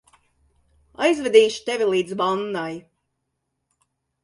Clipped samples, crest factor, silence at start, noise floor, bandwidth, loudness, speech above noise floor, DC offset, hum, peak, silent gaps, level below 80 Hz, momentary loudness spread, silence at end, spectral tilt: under 0.1%; 22 dB; 1 s; -77 dBFS; 11 kHz; -21 LUFS; 57 dB; under 0.1%; none; -2 dBFS; none; -64 dBFS; 13 LU; 1.45 s; -4 dB/octave